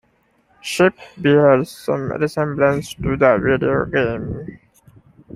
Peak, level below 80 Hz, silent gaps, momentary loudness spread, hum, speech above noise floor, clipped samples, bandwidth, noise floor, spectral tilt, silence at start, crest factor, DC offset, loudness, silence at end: 0 dBFS; -44 dBFS; none; 13 LU; none; 43 dB; under 0.1%; 15.5 kHz; -60 dBFS; -6.5 dB/octave; 0.65 s; 18 dB; under 0.1%; -18 LUFS; 0.8 s